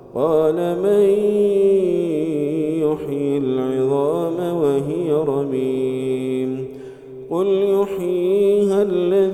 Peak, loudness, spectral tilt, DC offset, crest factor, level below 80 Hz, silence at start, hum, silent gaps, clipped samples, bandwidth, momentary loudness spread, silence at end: -6 dBFS; -19 LUFS; -8 dB/octave; under 0.1%; 12 dB; -56 dBFS; 0.05 s; none; none; under 0.1%; 13 kHz; 7 LU; 0 s